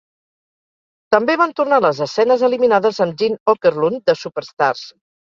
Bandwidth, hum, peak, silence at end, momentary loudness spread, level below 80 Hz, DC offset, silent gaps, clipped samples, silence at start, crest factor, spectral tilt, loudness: 7.4 kHz; none; -2 dBFS; 0.5 s; 5 LU; -64 dBFS; under 0.1%; 3.40-3.46 s; under 0.1%; 1.1 s; 16 dB; -5.5 dB/octave; -16 LUFS